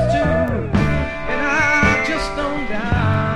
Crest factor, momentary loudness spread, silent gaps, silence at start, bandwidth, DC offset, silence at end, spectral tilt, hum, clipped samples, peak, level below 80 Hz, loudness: 16 dB; 8 LU; none; 0 s; 11.5 kHz; under 0.1%; 0 s; -6 dB/octave; none; under 0.1%; -2 dBFS; -30 dBFS; -18 LUFS